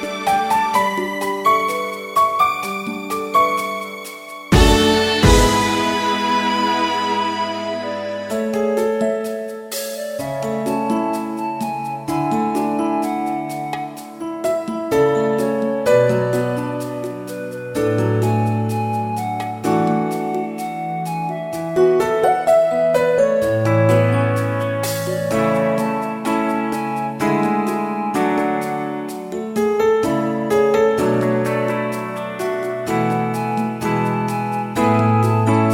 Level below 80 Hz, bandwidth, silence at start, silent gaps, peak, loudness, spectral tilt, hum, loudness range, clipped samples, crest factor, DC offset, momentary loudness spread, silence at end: -34 dBFS; 16.5 kHz; 0 s; none; 0 dBFS; -19 LUFS; -5.5 dB/octave; none; 6 LU; under 0.1%; 18 dB; under 0.1%; 10 LU; 0 s